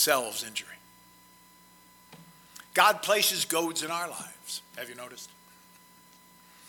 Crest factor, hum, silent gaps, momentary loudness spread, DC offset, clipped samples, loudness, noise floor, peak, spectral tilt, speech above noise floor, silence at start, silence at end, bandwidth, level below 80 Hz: 26 dB; none; none; 24 LU; under 0.1%; under 0.1%; -28 LUFS; -57 dBFS; -6 dBFS; -1 dB/octave; 28 dB; 0 s; 1.4 s; 17.5 kHz; -76 dBFS